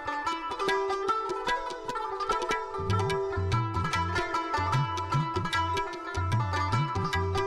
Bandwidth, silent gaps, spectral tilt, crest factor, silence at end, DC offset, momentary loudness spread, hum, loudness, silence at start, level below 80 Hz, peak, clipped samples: 13 kHz; none; -5.5 dB/octave; 12 dB; 0 s; under 0.1%; 4 LU; none; -29 LUFS; 0 s; -48 dBFS; -18 dBFS; under 0.1%